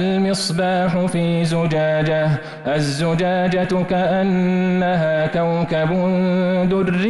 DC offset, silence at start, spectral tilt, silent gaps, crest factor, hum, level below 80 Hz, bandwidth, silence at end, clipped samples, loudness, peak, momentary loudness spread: under 0.1%; 0 s; -6.5 dB/octave; none; 8 dB; none; -46 dBFS; 11.5 kHz; 0 s; under 0.1%; -18 LUFS; -10 dBFS; 2 LU